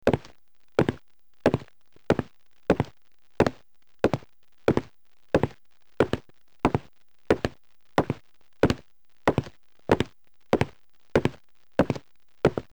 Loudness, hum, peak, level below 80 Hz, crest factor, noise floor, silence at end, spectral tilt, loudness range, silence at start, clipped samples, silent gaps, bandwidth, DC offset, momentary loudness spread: -28 LUFS; none; -10 dBFS; -48 dBFS; 18 dB; -65 dBFS; 0.15 s; -7 dB/octave; 1 LU; 0.05 s; under 0.1%; none; over 20 kHz; 0.4%; 8 LU